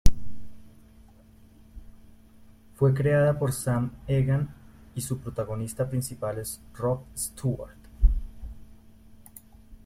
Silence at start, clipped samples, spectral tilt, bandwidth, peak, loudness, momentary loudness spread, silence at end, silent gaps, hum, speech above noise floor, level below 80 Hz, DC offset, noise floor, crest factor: 0.05 s; under 0.1%; -6.5 dB/octave; 16 kHz; -2 dBFS; -28 LUFS; 23 LU; 0.1 s; none; none; 26 dB; -34 dBFS; under 0.1%; -53 dBFS; 24 dB